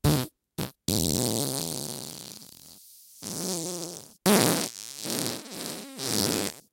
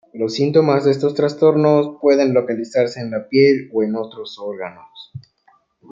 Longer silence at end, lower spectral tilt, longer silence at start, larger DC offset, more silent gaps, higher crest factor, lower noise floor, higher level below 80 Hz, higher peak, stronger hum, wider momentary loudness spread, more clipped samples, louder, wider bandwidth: second, 0.1 s vs 0.7 s; second, -3.5 dB/octave vs -7 dB/octave; about the same, 0.05 s vs 0.15 s; neither; neither; first, 26 dB vs 16 dB; second, -52 dBFS vs -58 dBFS; first, -52 dBFS vs -66 dBFS; about the same, -4 dBFS vs -2 dBFS; neither; about the same, 18 LU vs 16 LU; neither; second, -28 LUFS vs -17 LUFS; first, 17 kHz vs 7.6 kHz